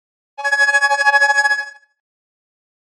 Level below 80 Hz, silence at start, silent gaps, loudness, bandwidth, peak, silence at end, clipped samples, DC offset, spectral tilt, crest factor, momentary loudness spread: -86 dBFS; 0.4 s; none; -14 LUFS; 12.5 kHz; -2 dBFS; 1.2 s; under 0.1%; under 0.1%; 4 dB/octave; 16 dB; 10 LU